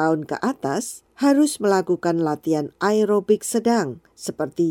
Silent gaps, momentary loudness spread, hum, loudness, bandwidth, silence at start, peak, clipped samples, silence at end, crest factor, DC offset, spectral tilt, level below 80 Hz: none; 10 LU; none; -21 LUFS; 17 kHz; 0 s; -6 dBFS; under 0.1%; 0 s; 16 dB; under 0.1%; -5 dB/octave; -66 dBFS